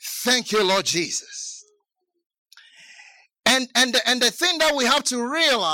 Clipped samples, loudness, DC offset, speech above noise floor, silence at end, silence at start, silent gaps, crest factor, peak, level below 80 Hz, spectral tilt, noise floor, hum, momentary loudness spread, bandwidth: under 0.1%; -19 LUFS; under 0.1%; 55 dB; 0 s; 0 s; 2.26-2.30 s, 2.38-2.45 s; 18 dB; -4 dBFS; -62 dBFS; -1 dB/octave; -76 dBFS; none; 9 LU; 17 kHz